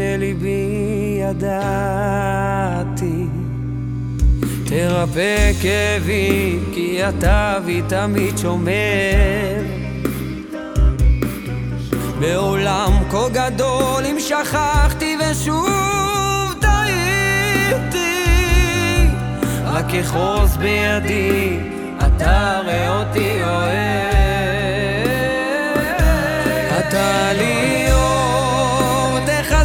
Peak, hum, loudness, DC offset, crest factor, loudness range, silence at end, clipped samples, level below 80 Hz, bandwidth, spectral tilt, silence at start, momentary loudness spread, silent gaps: -4 dBFS; none; -18 LUFS; under 0.1%; 14 dB; 4 LU; 0 s; under 0.1%; -22 dBFS; 19.5 kHz; -5 dB/octave; 0 s; 6 LU; none